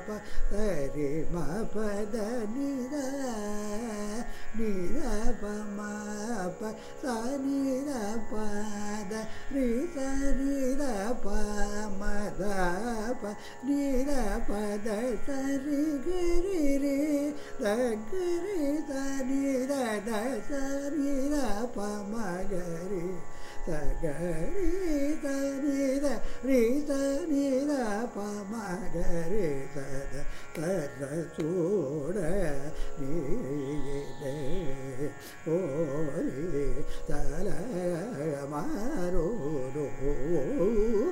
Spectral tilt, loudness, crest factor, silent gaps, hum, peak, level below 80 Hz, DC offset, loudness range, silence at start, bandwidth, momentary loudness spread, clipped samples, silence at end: -6 dB/octave; -32 LUFS; 16 dB; none; none; -12 dBFS; -36 dBFS; under 0.1%; 5 LU; 0 s; 13.5 kHz; 8 LU; under 0.1%; 0 s